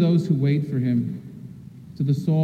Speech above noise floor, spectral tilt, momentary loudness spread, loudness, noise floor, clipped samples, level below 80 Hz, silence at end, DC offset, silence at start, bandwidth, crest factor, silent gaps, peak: 20 dB; -9.5 dB/octave; 21 LU; -23 LUFS; -41 dBFS; under 0.1%; -60 dBFS; 0 s; under 0.1%; 0 s; 8.6 kHz; 14 dB; none; -8 dBFS